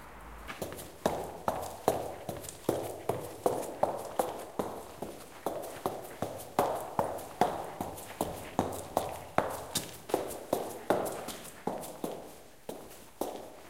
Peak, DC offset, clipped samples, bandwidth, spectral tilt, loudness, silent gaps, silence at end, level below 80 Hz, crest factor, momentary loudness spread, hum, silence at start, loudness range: -8 dBFS; 0.2%; under 0.1%; 17 kHz; -4.5 dB/octave; -36 LUFS; none; 0 s; -60 dBFS; 28 dB; 11 LU; none; 0 s; 2 LU